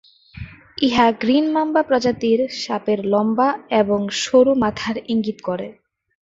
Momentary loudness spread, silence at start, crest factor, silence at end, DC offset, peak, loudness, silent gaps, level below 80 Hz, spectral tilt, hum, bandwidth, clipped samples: 12 LU; 0.35 s; 16 dB; 0.5 s; under 0.1%; -2 dBFS; -19 LUFS; none; -52 dBFS; -5 dB/octave; none; 7.8 kHz; under 0.1%